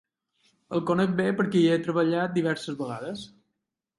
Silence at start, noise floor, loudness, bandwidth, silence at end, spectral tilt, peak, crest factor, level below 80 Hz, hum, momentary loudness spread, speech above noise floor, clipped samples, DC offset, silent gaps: 0.7 s; -82 dBFS; -26 LUFS; 11.5 kHz; 0.7 s; -7 dB/octave; -12 dBFS; 16 dB; -68 dBFS; none; 13 LU; 57 dB; under 0.1%; under 0.1%; none